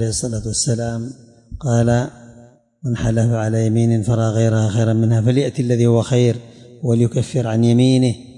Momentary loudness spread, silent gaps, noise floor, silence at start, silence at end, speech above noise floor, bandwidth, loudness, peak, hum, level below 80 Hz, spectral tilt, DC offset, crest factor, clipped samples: 10 LU; none; -46 dBFS; 0 s; 0.05 s; 30 dB; 11 kHz; -17 LUFS; -6 dBFS; none; -42 dBFS; -6.5 dB/octave; under 0.1%; 12 dB; under 0.1%